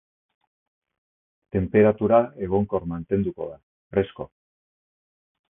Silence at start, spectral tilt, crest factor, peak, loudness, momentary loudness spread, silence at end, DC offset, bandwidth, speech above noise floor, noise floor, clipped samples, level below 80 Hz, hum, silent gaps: 1.55 s; -12.5 dB/octave; 22 dB; -4 dBFS; -23 LUFS; 17 LU; 1.3 s; under 0.1%; 3.7 kHz; over 68 dB; under -90 dBFS; under 0.1%; -48 dBFS; none; 3.63-3.90 s